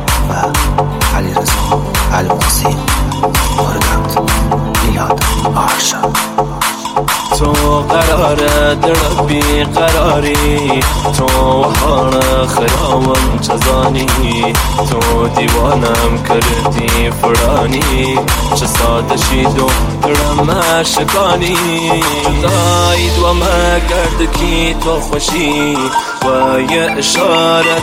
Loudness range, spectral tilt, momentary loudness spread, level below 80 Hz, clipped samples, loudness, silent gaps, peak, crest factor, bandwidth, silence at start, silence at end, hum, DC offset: 2 LU; -4 dB/octave; 3 LU; -18 dBFS; under 0.1%; -12 LUFS; none; 0 dBFS; 12 dB; 16.5 kHz; 0 s; 0 s; none; under 0.1%